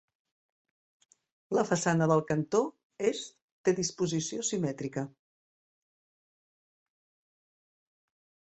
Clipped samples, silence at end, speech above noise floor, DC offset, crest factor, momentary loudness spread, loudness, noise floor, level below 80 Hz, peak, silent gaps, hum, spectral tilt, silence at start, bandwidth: under 0.1%; 3.4 s; over 61 dB; under 0.1%; 22 dB; 11 LU; -30 LUFS; under -90 dBFS; -70 dBFS; -12 dBFS; 2.84-2.90 s, 3.42-3.64 s; none; -5 dB/octave; 1.5 s; 8.6 kHz